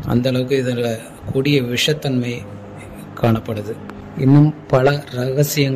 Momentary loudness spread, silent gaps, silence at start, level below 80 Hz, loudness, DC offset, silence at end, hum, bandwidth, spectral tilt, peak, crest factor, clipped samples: 18 LU; none; 0 s; -46 dBFS; -18 LUFS; under 0.1%; 0 s; none; 15.5 kHz; -6 dB/octave; -2 dBFS; 16 dB; under 0.1%